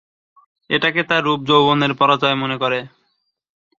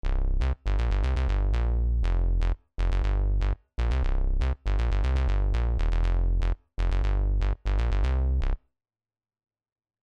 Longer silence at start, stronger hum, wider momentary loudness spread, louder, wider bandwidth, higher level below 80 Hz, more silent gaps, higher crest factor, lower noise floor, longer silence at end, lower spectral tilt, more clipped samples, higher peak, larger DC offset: first, 0.7 s vs 0.05 s; neither; first, 7 LU vs 4 LU; first, -17 LUFS vs -29 LUFS; first, 7.4 kHz vs 6.2 kHz; second, -60 dBFS vs -26 dBFS; neither; first, 18 dB vs 10 dB; second, -69 dBFS vs under -90 dBFS; second, 0.9 s vs 1.5 s; second, -6 dB/octave vs -7.5 dB/octave; neither; first, 0 dBFS vs -16 dBFS; neither